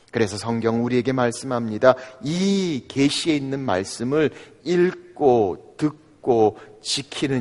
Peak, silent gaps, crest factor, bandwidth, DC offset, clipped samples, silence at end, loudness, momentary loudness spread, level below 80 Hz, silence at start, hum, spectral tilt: 0 dBFS; none; 22 dB; 11.5 kHz; under 0.1%; under 0.1%; 0 s; -22 LUFS; 8 LU; -56 dBFS; 0.15 s; none; -5.5 dB/octave